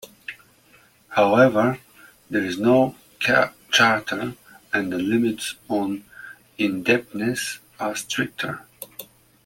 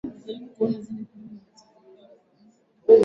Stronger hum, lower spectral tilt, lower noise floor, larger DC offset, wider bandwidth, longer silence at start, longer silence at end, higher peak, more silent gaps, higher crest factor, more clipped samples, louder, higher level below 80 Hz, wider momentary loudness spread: neither; second, -4.5 dB/octave vs -8 dB/octave; second, -55 dBFS vs -59 dBFS; neither; first, 17 kHz vs 5.8 kHz; about the same, 0.05 s vs 0.05 s; first, 0.4 s vs 0 s; about the same, -4 dBFS vs -4 dBFS; neither; about the same, 20 dB vs 22 dB; neither; first, -22 LUFS vs -26 LUFS; first, -62 dBFS vs -68 dBFS; about the same, 20 LU vs 21 LU